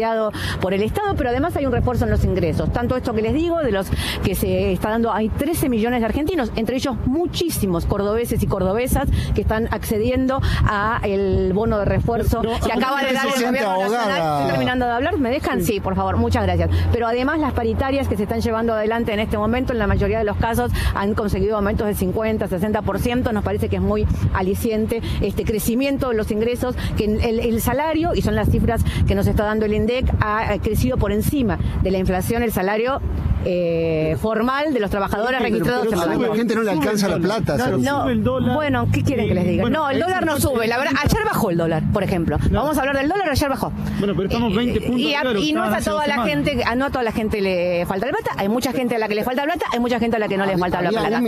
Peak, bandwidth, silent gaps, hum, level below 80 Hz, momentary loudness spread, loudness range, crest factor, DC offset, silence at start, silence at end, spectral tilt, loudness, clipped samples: -2 dBFS; 15 kHz; none; none; -30 dBFS; 3 LU; 2 LU; 18 dB; under 0.1%; 0 s; 0 s; -6 dB/octave; -20 LUFS; under 0.1%